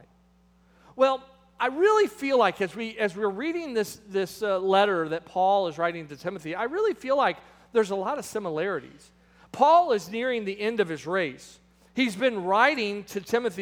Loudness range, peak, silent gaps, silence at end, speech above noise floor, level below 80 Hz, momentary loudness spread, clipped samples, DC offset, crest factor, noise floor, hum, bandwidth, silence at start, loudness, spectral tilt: 2 LU; -6 dBFS; none; 0 s; 35 dB; -66 dBFS; 10 LU; under 0.1%; under 0.1%; 20 dB; -61 dBFS; none; 17 kHz; 0.95 s; -26 LUFS; -4.5 dB/octave